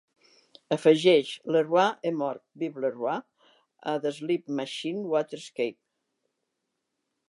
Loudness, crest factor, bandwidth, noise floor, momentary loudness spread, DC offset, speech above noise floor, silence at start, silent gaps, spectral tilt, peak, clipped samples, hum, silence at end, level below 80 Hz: -27 LUFS; 22 dB; 11.5 kHz; -82 dBFS; 12 LU; under 0.1%; 55 dB; 0.7 s; none; -5.5 dB/octave; -8 dBFS; under 0.1%; none; 1.55 s; -84 dBFS